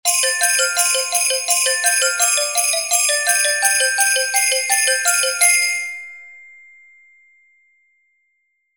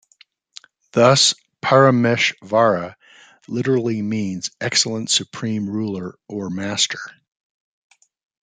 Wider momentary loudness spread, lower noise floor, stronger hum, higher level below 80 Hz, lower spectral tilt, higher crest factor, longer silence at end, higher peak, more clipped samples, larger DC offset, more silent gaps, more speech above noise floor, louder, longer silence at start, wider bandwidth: second, 3 LU vs 15 LU; first, -68 dBFS vs -56 dBFS; neither; second, -72 dBFS vs -64 dBFS; second, 5.5 dB/octave vs -3.5 dB/octave; about the same, 18 dB vs 18 dB; first, 2.35 s vs 1.35 s; about the same, 0 dBFS vs -2 dBFS; neither; neither; neither; first, 50 dB vs 37 dB; first, -15 LUFS vs -18 LUFS; second, 0.05 s vs 0.95 s; first, 17 kHz vs 9.6 kHz